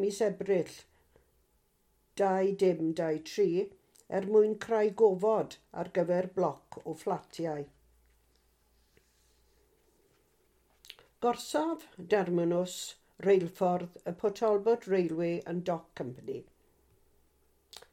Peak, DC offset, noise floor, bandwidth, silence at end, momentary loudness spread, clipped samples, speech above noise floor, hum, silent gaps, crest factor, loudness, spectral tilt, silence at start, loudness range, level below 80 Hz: -14 dBFS; under 0.1%; -72 dBFS; 15.5 kHz; 1.5 s; 15 LU; under 0.1%; 41 dB; none; none; 20 dB; -31 LUFS; -6 dB/octave; 0 s; 10 LU; -72 dBFS